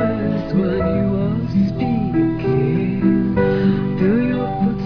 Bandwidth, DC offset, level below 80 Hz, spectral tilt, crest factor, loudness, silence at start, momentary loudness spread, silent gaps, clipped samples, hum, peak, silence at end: 5.4 kHz; under 0.1%; -36 dBFS; -10.5 dB/octave; 12 dB; -18 LUFS; 0 s; 3 LU; none; under 0.1%; none; -4 dBFS; 0 s